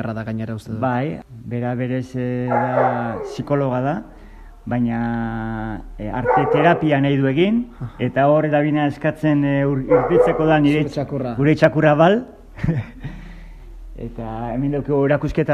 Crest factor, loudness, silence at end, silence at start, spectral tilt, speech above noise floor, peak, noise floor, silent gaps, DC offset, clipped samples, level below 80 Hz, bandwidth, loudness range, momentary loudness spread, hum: 18 dB; -19 LUFS; 0 s; 0 s; -8.5 dB/octave; 21 dB; 0 dBFS; -40 dBFS; none; under 0.1%; under 0.1%; -40 dBFS; 9.8 kHz; 6 LU; 14 LU; none